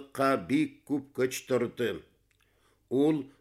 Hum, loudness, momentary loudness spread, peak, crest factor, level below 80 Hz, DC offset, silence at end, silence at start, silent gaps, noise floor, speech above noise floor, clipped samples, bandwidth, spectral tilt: none; -30 LUFS; 7 LU; -14 dBFS; 16 dB; -68 dBFS; under 0.1%; 0.1 s; 0 s; none; -69 dBFS; 40 dB; under 0.1%; 15.5 kHz; -5.5 dB/octave